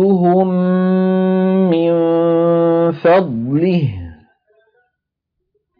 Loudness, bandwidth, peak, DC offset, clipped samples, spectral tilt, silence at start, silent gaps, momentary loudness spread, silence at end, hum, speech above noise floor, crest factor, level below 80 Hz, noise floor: -14 LUFS; 5 kHz; -2 dBFS; under 0.1%; under 0.1%; -11.5 dB/octave; 0 s; none; 5 LU; 1.65 s; none; 64 dB; 12 dB; -52 dBFS; -77 dBFS